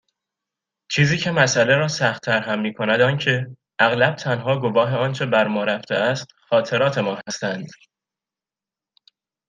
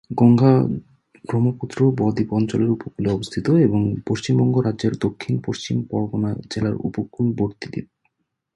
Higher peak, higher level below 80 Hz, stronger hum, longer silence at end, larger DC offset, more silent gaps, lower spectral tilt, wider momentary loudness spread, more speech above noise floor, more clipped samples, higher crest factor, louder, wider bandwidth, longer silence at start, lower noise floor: about the same, -2 dBFS vs -2 dBFS; second, -62 dBFS vs -50 dBFS; neither; first, 1.75 s vs 0.7 s; neither; neither; second, -4.5 dB/octave vs -8 dB/octave; about the same, 9 LU vs 10 LU; first, 70 dB vs 51 dB; neither; about the same, 20 dB vs 18 dB; about the same, -20 LUFS vs -21 LUFS; second, 9.4 kHz vs 11 kHz; first, 0.9 s vs 0.1 s; first, -90 dBFS vs -71 dBFS